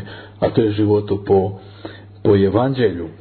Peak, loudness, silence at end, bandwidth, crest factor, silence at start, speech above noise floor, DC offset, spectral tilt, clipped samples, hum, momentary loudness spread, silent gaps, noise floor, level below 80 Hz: -2 dBFS; -17 LUFS; 0.05 s; 4.5 kHz; 16 dB; 0 s; 20 dB; under 0.1%; -11.5 dB/octave; under 0.1%; none; 20 LU; none; -36 dBFS; -48 dBFS